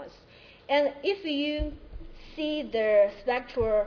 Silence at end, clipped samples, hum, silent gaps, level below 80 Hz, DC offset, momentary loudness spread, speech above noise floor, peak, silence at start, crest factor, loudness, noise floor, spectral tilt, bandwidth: 0 s; under 0.1%; none; none; -44 dBFS; under 0.1%; 23 LU; 27 dB; -12 dBFS; 0 s; 16 dB; -28 LUFS; -53 dBFS; -6.5 dB/octave; 5.4 kHz